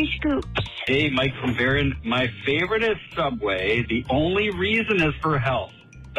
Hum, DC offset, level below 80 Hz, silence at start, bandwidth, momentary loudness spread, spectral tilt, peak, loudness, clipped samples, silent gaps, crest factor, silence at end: none; under 0.1%; -40 dBFS; 0 s; 12 kHz; 5 LU; -6.5 dB/octave; -10 dBFS; -23 LUFS; under 0.1%; none; 14 dB; 0 s